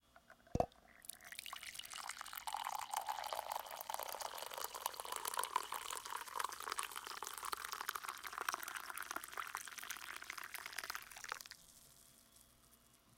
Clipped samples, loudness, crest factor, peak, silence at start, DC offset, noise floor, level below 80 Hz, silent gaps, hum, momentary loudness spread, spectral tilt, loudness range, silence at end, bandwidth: under 0.1%; -45 LUFS; 30 dB; -18 dBFS; 0.15 s; under 0.1%; -69 dBFS; -66 dBFS; none; none; 12 LU; -1.5 dB/octave; 4 LU; 0.05 s; 17 kHz